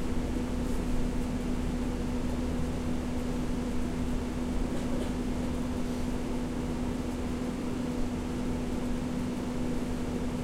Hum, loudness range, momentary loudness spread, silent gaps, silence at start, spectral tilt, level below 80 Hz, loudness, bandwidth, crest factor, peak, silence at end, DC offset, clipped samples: none; 1 LU; 1 LU; none; 0 s; -6.5 dB/octave; -36 dBFS; -33 LUFS; 15.5 kHz; 14 dB; -18 dBFS; 0 s; under 0.1%; under 0.1%